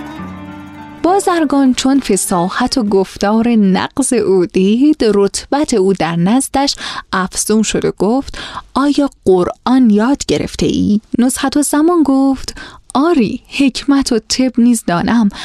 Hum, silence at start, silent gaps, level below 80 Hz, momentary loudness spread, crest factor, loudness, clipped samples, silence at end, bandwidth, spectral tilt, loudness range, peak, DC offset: none; 0 s; none; -38 dBFS; 8 LU; 12 dB; -13 LUFS; under 0.1%; 0 s; 14.5 kHz; -4.5 dB/octave; 2 LU; 0 dBFS; under 0.1%